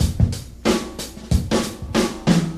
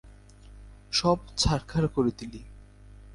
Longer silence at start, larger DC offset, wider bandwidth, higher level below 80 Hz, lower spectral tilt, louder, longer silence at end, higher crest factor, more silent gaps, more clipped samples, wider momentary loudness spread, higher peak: about the same, 0 s vs 0.05 s; neither; first, 15.5 kHz vs 11.5 kHz; first, -28 dBFS vs -42 dBFS; about the same, -5.5 dB/octave vs -5 dB/octave; first, -22 LUFS vs -27 LUFS; about the same, 0 s vs 0 s; about the same, 18 dB vs 20 dB; neither; neither; second, 5 LU vs 17 LU; first, -2 dBFS vs -10 dBFS